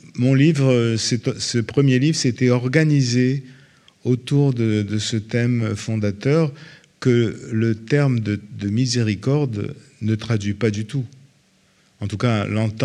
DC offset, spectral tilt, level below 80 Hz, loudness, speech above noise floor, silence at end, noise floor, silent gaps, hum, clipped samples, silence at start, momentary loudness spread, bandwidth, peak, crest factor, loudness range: under 0.1%; -6 dB/octave; -62 dBFS; -20 LUFS; 39 dB; 0 s; -58 dBFS; none; none; under 0.1%; 0.05 s; 9 LU; 11 kHz; 0 dBFS; 20 dB; 5 LU